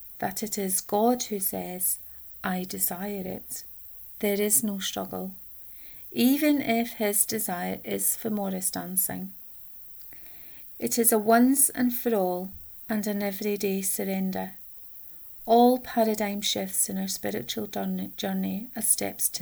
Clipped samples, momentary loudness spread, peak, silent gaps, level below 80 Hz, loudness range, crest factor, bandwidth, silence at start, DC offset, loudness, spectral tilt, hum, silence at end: under 0.1%; 16 LU; -6 dBFS; none; -62 dBFS; 5 LU; 20 dB; over 20 kHz; 0 s; under 0.1%; -26 LUFS; -3.5 dB/octave; none; 0 s